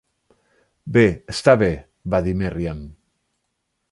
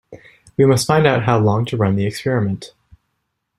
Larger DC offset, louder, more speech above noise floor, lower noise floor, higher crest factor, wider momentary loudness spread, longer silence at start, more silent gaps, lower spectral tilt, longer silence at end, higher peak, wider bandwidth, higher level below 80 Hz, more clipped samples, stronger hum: neither; second, -20 LUFS vs -17 LUFS; about the same, 56 dB vs 57 dB; about the same, -75 dBFS vs -73 dBFS; about the same, 20 dB vs 16 dB; first, 15 LU vs 9 LU; first, 0.85 s vs 0.1 s; neither; about the same, -6.5 dB/octave vs -6 dB/octave; about the same, 1 s vs 0.9 s; about the same, -2 dBFS vs -2 dBFS; second, 11.5 kHz vs 13.5 kHz; first, -40 dBFS vs -50 dBFS; neither; neither